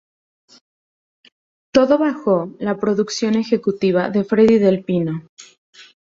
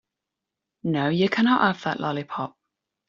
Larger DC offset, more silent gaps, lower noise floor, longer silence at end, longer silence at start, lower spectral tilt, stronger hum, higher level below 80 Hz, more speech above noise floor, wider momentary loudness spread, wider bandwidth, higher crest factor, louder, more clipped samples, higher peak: neither; first, 5.29-5.37 s, 5.58-5.73 s vs none; first, under -90 dBFS vs -85 dBFS; second, 0.3 s vs 0.6 s; first, 1.75 s vs 0.85 s; first, -6.5 dB/octave vs -4 dB/octave; neither; first, -58 dBFS vs -66 dBFS; first, over 73 dB vs 63 dB; second, 8 LU vs 13 LU; about the same, 7.8 kHz vs 7.4 kHz; about the same, 16 dB vs 18 dB; first, -18 LUFS vs -24 LUFS; neither; first, -2 dBFS vs -6 dBFS